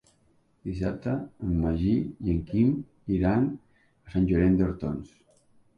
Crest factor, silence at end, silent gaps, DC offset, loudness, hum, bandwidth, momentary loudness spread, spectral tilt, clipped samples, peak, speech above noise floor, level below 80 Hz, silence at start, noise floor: 16 dB; 0.7 s; none; under 0.1%; -27 LUFS; none; 6.8 kHz; 11 LU; -10 dB/octave; under 0.1%; -12 dBFS; 39 dB; -40 dBFS; 0.65 s; -65 dBFS